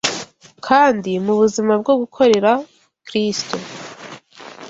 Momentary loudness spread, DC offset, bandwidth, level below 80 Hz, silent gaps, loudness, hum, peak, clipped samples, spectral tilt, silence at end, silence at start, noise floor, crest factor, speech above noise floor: 20 LU; under 0.1%; 8.2 kHz; -60 dBFS; none; -17 LUFS; none; -2 dBFS; under 0.1%; -4 dB/octave; 0 s; 0.05 s; -38 dBFS; 16 dB; 23 dB